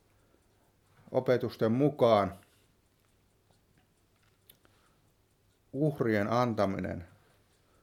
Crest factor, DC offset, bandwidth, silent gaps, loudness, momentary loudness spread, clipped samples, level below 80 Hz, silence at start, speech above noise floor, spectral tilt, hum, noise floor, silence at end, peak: 22 dB; under 0.1%; 16.5 kHz; none; -30 LUFS; 14 LU; under 0.1%; -68 dBFS; 1.1 s; 41 dB; -7.5 dB/octave; none; -69 dBFS; 0.75 s; -12 dBFS